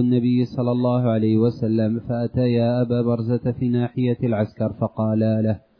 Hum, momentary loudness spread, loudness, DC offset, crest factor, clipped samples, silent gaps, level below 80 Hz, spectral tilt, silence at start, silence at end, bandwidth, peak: none; 5 LU; -21 LUFS; under 0.1%; 12 dB; under 0.1%; none; -54 dBFS; -11 dB/octave; 0 s; 0.2 s; 5.4 kHz; -8 dBFS